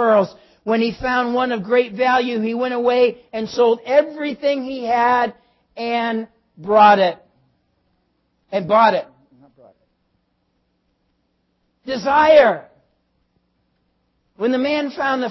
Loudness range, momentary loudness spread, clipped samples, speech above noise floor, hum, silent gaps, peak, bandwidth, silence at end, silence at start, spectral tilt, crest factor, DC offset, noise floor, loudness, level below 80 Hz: 5 LU; 15 LU; under 0.1%; 51 dB; none; none; -2 dBFS; 6.2 kHz; 0 s; 0 s; -5.5 dB/octave; 18 dB; under 0.1%; -68 dBFS; -18 LUFS; -56 dBFS